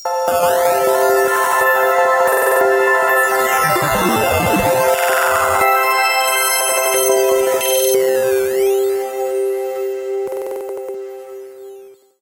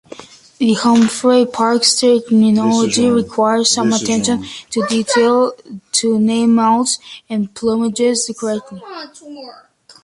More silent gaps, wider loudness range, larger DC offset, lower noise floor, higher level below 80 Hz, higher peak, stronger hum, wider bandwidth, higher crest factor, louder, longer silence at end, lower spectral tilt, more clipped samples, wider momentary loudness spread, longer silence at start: neither; about the same, 6 LU vs 4 LU; neither; about the same, -40 dBFS vs -37 dBFS; first, -46 dBFS vs -56 dBFS; about the same, -2 dBFS vs 0 dBFS; neither; first, 16.5 kHz vs 11.5 kHz; about the same, 14 dB vs 16 dB; about the same, -15 LUFS vs -14 LUFS; second, 0.3 s vs 0.5 s; about the same, -2.5 dB/octave vs -3.5 dB/octave; neither; about the same, 11 LU vs 13 LU; second, 0 s vs 0.2 s